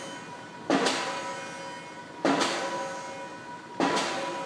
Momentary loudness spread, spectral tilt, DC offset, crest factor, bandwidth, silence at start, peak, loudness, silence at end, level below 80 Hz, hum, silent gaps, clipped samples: 15 LU; -3 dB/octave; under 0.1%; 20 dB; 11 kHz; 0 s; -10 dBFS; -30 LUFS; 0 s; -74 dBFS; none; none; under 0.1%